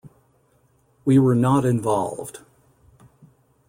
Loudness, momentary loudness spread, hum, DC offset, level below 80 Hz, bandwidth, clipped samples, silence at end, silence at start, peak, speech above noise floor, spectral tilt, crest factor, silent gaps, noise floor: -20 LUFS; 15 LU; none; under 0.1%; -58 dBFS; 16 kHz; under 0.1%; 1.3 s; 0.05 s; -6 dBFS; 43 dB; -8 dB/octave; 16 dB; none; -62 dBFS